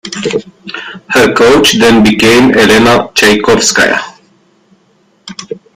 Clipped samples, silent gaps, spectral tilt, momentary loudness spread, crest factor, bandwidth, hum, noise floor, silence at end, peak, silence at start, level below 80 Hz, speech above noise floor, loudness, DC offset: 0.3%; none; -3.5 dB/octave; 19 LU; 8 dB; 16.5 kHz; none; -51 dBFS; 0.2 s; 0 dBFS; 0.05 s; -38 dBFS; 44 dB; -7 LUFS; under 0.1%